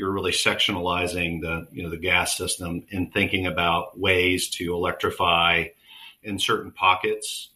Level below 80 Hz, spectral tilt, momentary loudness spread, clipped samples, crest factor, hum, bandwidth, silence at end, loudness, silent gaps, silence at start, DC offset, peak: -50 dBFS; -3 dB/octave; 10 LU; under 0.1%; 20 dB; none; 15.5 kHz; 0.1 s; -23 LUFS; none; 0 s; under 0.1%; -4 dBFS